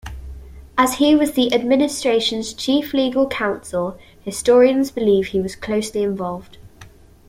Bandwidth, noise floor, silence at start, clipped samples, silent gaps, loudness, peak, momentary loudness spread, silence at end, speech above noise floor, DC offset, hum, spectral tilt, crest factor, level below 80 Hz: 16.5 kHz; -44 dBFS; 0.05 s; under 0.1%; none; -18 LUFS; -2 dBFS; 14 LU; 0.4 s; 26 dB; under 0.1%; none; -4.5 dB/octave; 16 dB; -44 dBFS